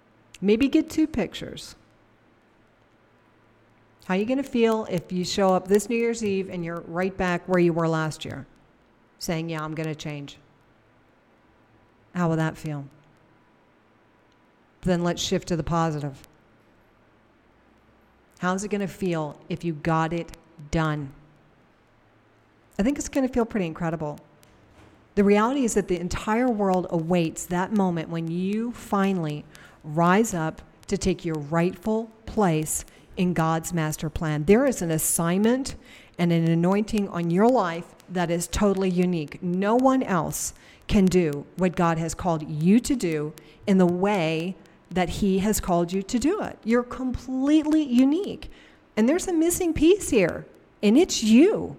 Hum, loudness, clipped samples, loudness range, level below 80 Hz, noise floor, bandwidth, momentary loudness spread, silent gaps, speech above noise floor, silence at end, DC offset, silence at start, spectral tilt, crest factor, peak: none; -24 LUFS; under 0.1%; 9 LU; -46 dBFS; -60 dBFS; 16.5 kHz; 13 LU; none; 36 dB; 0 s; under 0.1%; 0.4 s; -5.5 dB/octave; 18 dB; -6 dBFS